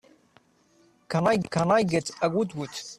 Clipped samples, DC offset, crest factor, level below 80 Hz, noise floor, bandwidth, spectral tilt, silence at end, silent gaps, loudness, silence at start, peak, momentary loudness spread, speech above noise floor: under 0.1%; under 0.1%; 18 dB; -62 dBFS; -62 dBFS; 13.5 kHz; -5.5 dB/octave; 0.05 s; none; -26 LUFS; 1.1 s; -10 dBFS; 8 LU; 37 dB